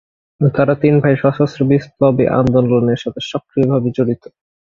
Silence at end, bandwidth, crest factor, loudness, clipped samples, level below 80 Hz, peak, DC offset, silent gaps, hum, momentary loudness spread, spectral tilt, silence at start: 0.5 s; 7.2 kHz; 14 dB; -15 LUFS; under 0.1%; -46 dBFS; 0 dBFS; under 0.1%; none; none; 8 LU; -8.5 dB/octave; 0.4 s